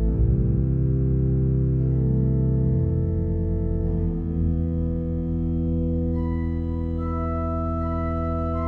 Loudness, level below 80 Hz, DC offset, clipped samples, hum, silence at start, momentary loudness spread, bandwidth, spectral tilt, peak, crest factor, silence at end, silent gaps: -24 LUFS; -28 dBFS; under 0.1%; under 0.1%; none; 0 s; 5 LU; 3.1 kHz; -12.5 dB/octave; -10 dBFS; 12 dB; 0 s; none